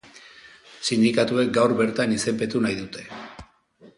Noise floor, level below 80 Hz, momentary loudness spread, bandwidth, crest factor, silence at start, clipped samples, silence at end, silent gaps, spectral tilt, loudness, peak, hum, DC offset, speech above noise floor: -54 dBFS; -58 dBFS; 17 LU; 11.5 kHz; 18 dB; 0.45 s; under 0.1%; 0.1 s; none; -4.5 dB/octave; -22 LUFS; -6 dBFS; none; under 0.1%; 32 dB